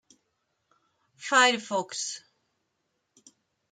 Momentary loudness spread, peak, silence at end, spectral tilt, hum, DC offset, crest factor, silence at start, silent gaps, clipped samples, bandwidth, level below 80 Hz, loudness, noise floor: 19 LU; -8 dBFS; 1.55 s; -1 dB/octave; none; under 0.1%; 24 dB; 1.2 s; none; under 0.1%; 9.8 kHz; -86 dBFS; -25 LUFS; -78 dBFS